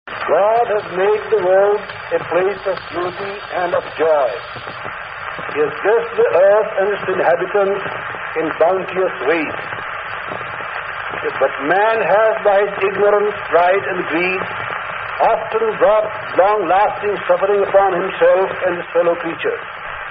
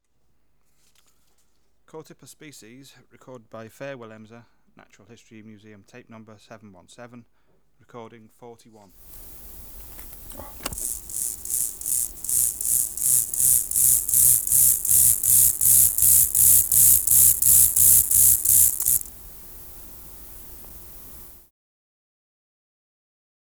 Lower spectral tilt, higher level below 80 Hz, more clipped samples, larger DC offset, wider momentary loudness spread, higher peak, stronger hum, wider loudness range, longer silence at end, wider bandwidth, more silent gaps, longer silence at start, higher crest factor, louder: first, -2.5 dB/octave vs -0.5 dB/octave; about the same, -52 dBFS vs -48 dBFS; neither; second, under 0.1% vs 0.1%; second, 11 LU vs 26 LU; first, 0 dBFS vs -6 dBFS; neither; second, 5 LU vs 17 LU; second, 0 s vs 2.25 s; second, 5.2 kHz vs over 20 kHz; neither; second, 0.05 s vs 1.95 s; about the same, 16 dB vs 18 dB; about the same, -17 LUFS vs -16 LUFS